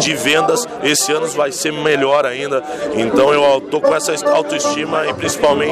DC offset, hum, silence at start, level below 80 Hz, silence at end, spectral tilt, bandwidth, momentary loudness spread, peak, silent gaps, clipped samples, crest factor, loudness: under 0.1%; none; 0 s; -52 dBFS; 0 s; -3 dB/octave; 15 kHz; 5 LU; -4 dBFS; none; under 0.1%; 12 dB; -15 LUFS